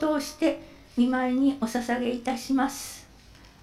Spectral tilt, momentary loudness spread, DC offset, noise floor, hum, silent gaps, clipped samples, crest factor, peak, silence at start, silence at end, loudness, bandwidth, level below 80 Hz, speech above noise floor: -4 dB/octave; 13 LU; under 0.1%; -51 dBFS; none; none; under 0.1%; 16 dB; -12 dBFS; 0 s; 0.15 s; -27 LUFS; 15 kHz; -56 dBFS; 25 dB